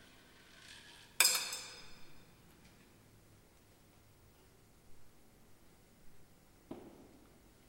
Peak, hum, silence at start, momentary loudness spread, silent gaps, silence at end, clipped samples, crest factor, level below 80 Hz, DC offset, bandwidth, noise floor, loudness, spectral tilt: -12 dBFS; none; 0 s; 31 LU; none; 0.2 s; under 0.1%; 32 dB; -70 dBFS; under 0.1%; 16.5 kHz; -64 dBFS; -32 LUFS; 1 dB/octave